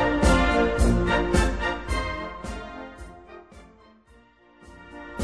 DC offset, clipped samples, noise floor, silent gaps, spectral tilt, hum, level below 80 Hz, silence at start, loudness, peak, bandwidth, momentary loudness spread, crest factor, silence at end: under 0.1%; under 0.1%; -56 dBFS; none; -5.5 dB/octave; none; -30 dBFS; 0 s; -24 LUFS; -8 dBFS; 11 kHz; 24 LU; 18 dB; 0 s